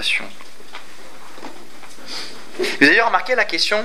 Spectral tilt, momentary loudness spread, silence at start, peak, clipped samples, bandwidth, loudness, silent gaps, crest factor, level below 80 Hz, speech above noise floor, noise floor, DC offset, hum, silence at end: -2.5 dB/octave; 25 LU; 0 s; 0 dBFS; under 0.1%; 16 kHz; -16 LUFS; none; 22 dB; -68 dBFS; 25 dB; -42 dBFS; 5%; none; 0 s